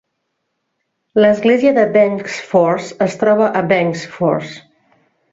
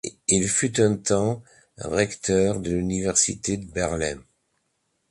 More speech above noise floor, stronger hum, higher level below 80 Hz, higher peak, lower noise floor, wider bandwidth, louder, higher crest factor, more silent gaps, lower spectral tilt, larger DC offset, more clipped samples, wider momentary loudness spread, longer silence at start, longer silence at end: first, 58 dB vs 50 dB; neither; second, -58 dBFS vs -46 dBFS; first, -2 dBFS vs -6 dBFS; about the same, -72 dBFS vs -73 dBFS; second, 7.8 kHz vs 11.5 kHz; first, -15 LUFS vs -23 LUFS; second, 14 dB vs 20 dB; neither; first, -6 dB/octave vs -4 dB/octave; neither; neither; about the same, 8 LU vs 8 LU; first, 1.15 s vs 0.05 s; second, 0.75 s vs 0.9 s